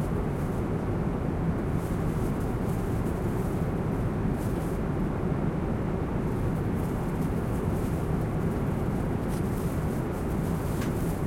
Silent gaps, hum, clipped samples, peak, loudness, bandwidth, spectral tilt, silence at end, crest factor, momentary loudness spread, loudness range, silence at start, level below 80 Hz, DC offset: none; none; under 0.1%; -14 dBFS; -29 LUFS; 16.5 kHz; -8 dB/octave; 0 s; 14 dB; 1 LU; 0 LU; 0 s; -36 dBFS; under 0.1%